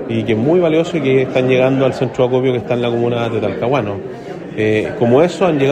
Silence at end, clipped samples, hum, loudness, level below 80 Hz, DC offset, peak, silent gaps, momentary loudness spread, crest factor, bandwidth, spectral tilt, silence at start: 0 s; under 0.1%; none; -15 LUFS; -50 dBFS; under 0.1%; 0 dBFS; none; 6 LU; 14 dB; 9.4 kHz; -7.5 dB/octave; 0 s